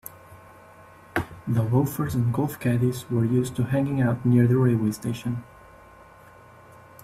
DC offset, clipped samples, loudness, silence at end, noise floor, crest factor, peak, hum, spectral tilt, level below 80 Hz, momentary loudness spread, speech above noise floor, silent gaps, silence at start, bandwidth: under 0.1%; under 0.1%; -24 LUFS; 1.6 s; -49 dBFS; 18 dB; -8 dBFS; none; -8 dB/octave; -54 dBFS; 11 LU; 27 dB; none; 0.05 s; 14.5 kHz